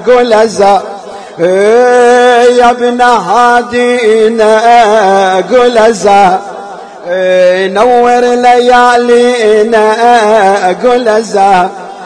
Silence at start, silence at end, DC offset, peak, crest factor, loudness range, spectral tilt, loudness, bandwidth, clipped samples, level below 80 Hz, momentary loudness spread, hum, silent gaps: 0 s; 0 s; under 0.1%; 0 dBFS; 6 dB; 1 LU; -4 dB/octave; -6 LUFS; 10.5 kHz; 3%; -44 dBFS; 7 LU; none; none